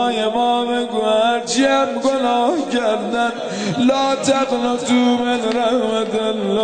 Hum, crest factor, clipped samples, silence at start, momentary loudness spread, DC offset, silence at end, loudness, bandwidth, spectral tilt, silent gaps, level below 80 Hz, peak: none; 14 dB; under 0.1%; 0 s; 4 LU; 0.3%; 0 s; -17 LUFS; 9.4 kHz; -4 dB/octave; none; -58 dBFS; -4 dBFS